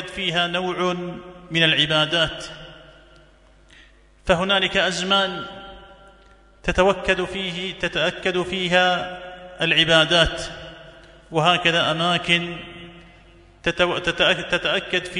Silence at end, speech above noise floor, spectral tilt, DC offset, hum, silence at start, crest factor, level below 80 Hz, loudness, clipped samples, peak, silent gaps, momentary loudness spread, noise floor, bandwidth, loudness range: 0 s; 31 dB; -4 dB/octave; under 0.1%; none; 0 s; 20 dB; -44 dBFS; -20 LUFS; under 0.1%; -2 dBFS; none; 18 LU; -52 dBFS; 11 kHz; 4 LU